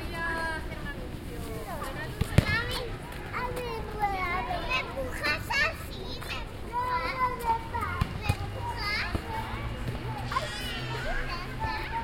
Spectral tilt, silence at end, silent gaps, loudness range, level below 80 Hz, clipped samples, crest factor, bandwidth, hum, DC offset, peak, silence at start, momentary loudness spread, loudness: -5 dB/octave; 0 s; none; 2 LU; -40 dBFS; under 0.1%; 28 dB; 16.5 kHz; none; under 0.1%; -4 dBFS; 0 s; 10 LU; -32 LUFS